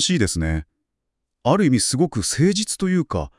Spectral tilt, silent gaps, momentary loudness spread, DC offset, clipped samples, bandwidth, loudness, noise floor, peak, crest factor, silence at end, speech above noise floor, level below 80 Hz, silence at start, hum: -4.5 dB/octave; none; 8 LU; under 0.1%; under 0.1%; 12 kHz; -20 LUFS; -79 dBFS; -4 dBFS; 16 dB; 0.1 s; 59 dB; -40 dBFS; 0 s; none